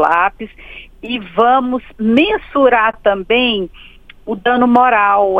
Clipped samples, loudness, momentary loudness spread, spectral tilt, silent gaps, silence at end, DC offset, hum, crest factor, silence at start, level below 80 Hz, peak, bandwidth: under 0.1%; -13 LUFS; 20 LU; -6.5 dB/octave; none; 0 s; under 0.1%; none; 14 dB; 0 s; -42 dBFS; 0 dBFS; 5.2 kHz